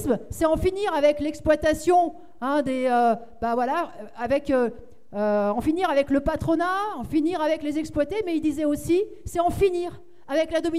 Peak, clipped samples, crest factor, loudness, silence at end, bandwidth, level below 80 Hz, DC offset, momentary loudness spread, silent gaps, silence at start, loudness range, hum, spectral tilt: -8 dBFS; under 0.1%; 16 dB; -24 LUFS; 0 s; 15.5 kHz; -44 dBFS; 0.7%; 7 LU; none; 0 s; 2 LU; none; -6 dB/octave